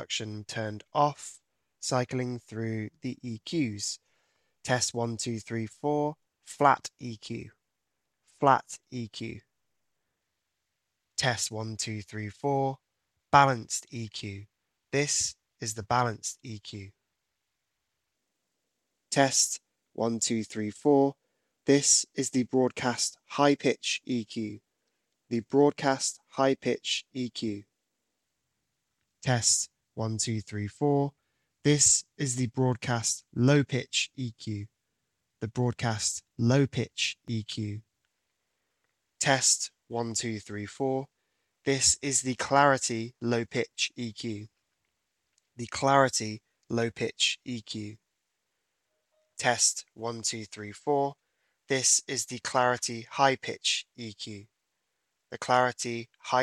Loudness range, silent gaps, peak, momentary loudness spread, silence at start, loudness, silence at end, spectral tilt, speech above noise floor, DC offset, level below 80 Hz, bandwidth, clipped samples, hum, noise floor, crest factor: 7 LU; none; -4 dBFS; 16 LU; 0 s; -28 LUFS; 0 s; -3.5 dB/octave; 55 dB; under 0.1%; -68 dBFS; 14 kHz; under 0.1%; none; -84 dBFS; 26 dB